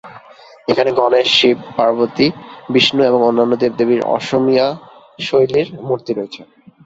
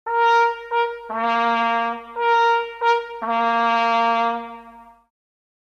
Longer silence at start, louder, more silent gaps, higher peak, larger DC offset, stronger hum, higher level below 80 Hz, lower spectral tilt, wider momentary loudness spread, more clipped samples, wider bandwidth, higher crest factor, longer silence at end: about the same, 0.05 s vs 0.05 s; first, -15 LUFS vs -20 LUFS; neither; first, 0 dBFS vs -8 dBFS; neither; neither; first, -56 dBFS vs -64 dBFS; first, -5 dB/octave vs -3 dB/octave; first, 12 LU vs 8 LU; neither; about the same, 8 kHz vs 7.6 kHz; about the same, 16 dB vs 14 dB; second, 0.4 s vs 0.95 s